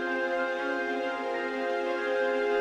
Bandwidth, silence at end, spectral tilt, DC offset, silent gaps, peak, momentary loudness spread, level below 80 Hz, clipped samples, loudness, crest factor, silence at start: 10 kHz; 0 s; -3.5 dB/octave; under 0.1%; none; -18 dBFS; 4 LU; -70 dBFS; under 0.1%; -30 LUFS; 12 dB; 0 s